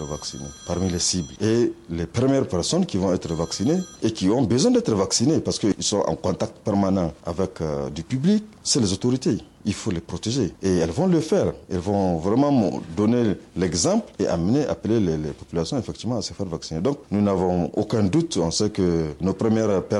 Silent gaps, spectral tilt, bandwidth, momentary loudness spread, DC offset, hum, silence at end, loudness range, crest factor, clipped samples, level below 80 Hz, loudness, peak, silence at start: none; -5.5 dB/octave; 12 kHz; 8 LU; under 0.1%; none; 0 s; 3 LU; 14 dB; under 0.1%; -46 dBFS; -23 LUFS; -8 dBFS; 0 s